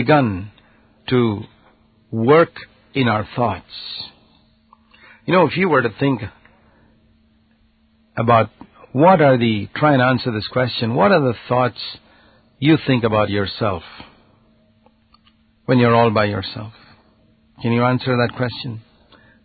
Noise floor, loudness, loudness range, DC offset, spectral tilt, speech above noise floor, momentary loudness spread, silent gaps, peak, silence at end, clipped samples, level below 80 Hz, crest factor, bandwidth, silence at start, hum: -58 dBFS; -18 LUFS; 5 LU; under 0.1%; -12 dB/octave; 41 dB; 17 LU; none; 0 dBFS; 0.65 s; under 0.1%; -48 dBFS; 18 dB; 4.8 kHz; 0 s; none